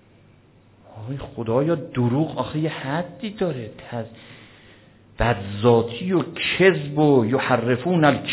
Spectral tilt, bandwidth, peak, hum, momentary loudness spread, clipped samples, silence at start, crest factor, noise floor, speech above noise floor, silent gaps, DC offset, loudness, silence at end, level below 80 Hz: -10.5 dB/octave; 4 kHz; -4 dBFS; none; 15 LU; under 0.1%; 0.9 s; 18 dB; -53 dBFS; 32 dB; none; under 0.1%; -21 LUFS; 0 s; -46 dBFS